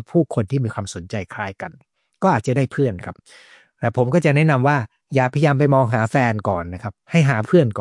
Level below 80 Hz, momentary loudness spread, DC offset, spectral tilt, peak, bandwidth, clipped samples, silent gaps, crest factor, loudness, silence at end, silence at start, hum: -58 dBFS; 13 LU; under 0.1%; -7.5 dB/octave; -2 dBFS; 11.5 kHz; under 0.1%; none; 16 dB; -19 LUFS; 0 s; 0 s; none